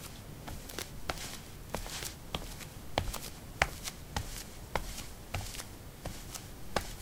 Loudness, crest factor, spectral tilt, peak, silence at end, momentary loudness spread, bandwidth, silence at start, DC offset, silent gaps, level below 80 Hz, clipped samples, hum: -40 LUFS; 38 dB; -3 dB/octave; -2 dBFS; 0 s; 11 LU; 18 kHz; 0 s; under 0.1%; none; -48 dBFS; under 0.1%; none